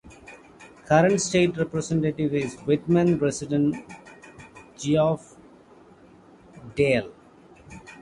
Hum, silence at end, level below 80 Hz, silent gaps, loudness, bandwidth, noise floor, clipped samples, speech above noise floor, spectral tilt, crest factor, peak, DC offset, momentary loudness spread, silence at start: none; 0.1 s; -56 dBFS; none; -23 LUFS; 11.5 kHz; -52 dBFS; under 0.1%; 29 dB; -6 dB/octave; 20 dB; -4 dBFS; under 0.1%; 24 LU; 0.05 s